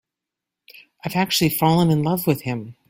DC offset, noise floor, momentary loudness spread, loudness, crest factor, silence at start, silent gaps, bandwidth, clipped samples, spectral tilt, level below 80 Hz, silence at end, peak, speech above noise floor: under 0.1%; -85 dBFS; 10 LU; -20 LUFS; 18 dB; 1.05 s; none; 16.5 kHz; under 0.1%; -5.5 dB/octave; -54 dBFS; 0.2 s; -4 dBFS; 65 dB